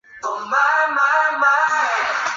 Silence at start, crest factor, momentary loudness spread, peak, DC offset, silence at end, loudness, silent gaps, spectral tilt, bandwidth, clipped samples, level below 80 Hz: 0.15 s; 14 dB; 6 LU; -4 dBFS; under 0.1%; 0 s; -17 LUFS; none; -0.5 dB/octave; 7.8 kHz; under 0.1%; -68 dBFS